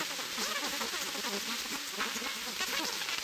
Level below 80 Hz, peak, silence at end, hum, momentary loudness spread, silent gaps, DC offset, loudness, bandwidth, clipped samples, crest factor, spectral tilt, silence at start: -70 dBFS; -18 dBFS; 0 s; none; 2 LU; none; under 0.1%; -34 LUFS; 16 kHz; under 0.1%; 18 dB; 0 dB/octave; 0 s